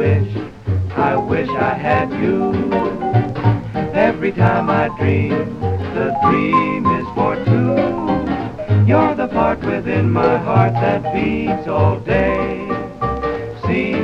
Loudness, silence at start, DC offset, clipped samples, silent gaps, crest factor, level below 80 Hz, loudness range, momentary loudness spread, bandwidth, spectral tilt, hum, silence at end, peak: -17 LUFS; 0 s; under 0.1%; under 0.1%; none; 16 dB; -38 dBFS; 2 LU; 7 LU; 6.4 kHz; -9 dB/octave; none; 0 s; 0 dBFS